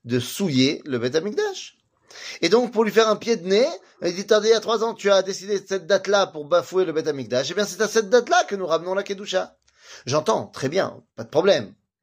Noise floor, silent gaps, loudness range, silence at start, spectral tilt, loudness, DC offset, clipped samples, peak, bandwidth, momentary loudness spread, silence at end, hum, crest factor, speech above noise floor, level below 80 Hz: -44 dBFS; none; 3 LU; 0.05 s; -4 dB/octave; -22 LUFS; under 0.1%; under 0.1%; -4 dBFS; 15.5 kHz; 9 LU; 0.3 s; none; 18 dB; 23 dB; -68 dBFS